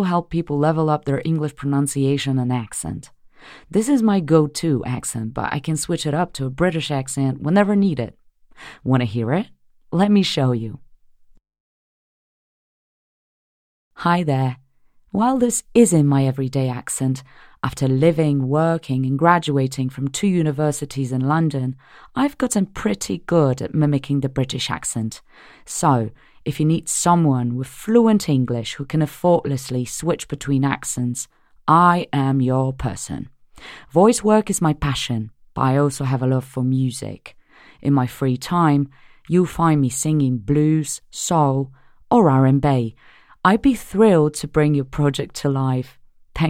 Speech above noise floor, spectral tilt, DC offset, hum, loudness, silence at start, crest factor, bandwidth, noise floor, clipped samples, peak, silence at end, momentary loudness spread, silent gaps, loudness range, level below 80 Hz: 36 dB; -6 dB/octave; under 0.1%; none; -20 LUFS; 0 s; 20 dB; 15.5 kHz; -55 dBFS; under 0.1%; 0 dBFS; 0 s; 11 LU; 11.60-13.91 s; 4 LU; -48 dBFS